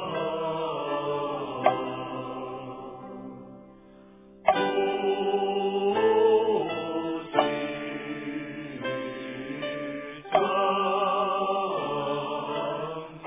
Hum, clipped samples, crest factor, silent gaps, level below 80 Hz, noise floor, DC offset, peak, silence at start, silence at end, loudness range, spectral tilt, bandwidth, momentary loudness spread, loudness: none; under 0.1%; 22 dB; none; -66 dBFS; -51 dBFS; under 0.1%; -6 dBFS; 0 s; 0 s; 6 LU; -9 dB/octave; 3.8 kHz; 13 LU; -28 LUFS